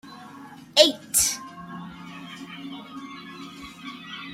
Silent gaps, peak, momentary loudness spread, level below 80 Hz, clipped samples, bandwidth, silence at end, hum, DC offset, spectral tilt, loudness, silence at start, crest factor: none; 0 dBFS; 22 LU; -60 dBFS; under 0.1%; 16 kHz; 0 s; none; under 0.1%; -1 dB/octave; -20 LUFS; 0.05 s; 28 dB